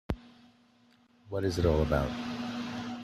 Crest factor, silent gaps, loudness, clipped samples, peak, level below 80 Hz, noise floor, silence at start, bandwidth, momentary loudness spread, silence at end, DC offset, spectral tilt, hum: 18 dB; none; -32 LUFS; under 0.1%; -14 dBFS; -44 dBFS; -64 dBFS; 0.1 s; 14 kHz; 12 LU; 0 s; under 0.1%; -6.5 dB/octave; none